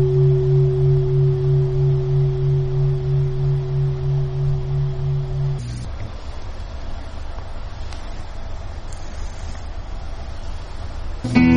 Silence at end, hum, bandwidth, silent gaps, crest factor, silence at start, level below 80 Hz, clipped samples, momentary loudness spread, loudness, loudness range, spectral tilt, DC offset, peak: 0 s; none; 7.2 kHz; none; 18 dB; 0 s; -28 dBFS; under 0.1%; 17 LU; -20 LUFS; 15 LU; -8.5 dB/octave; under 0.1%; -2 dBFS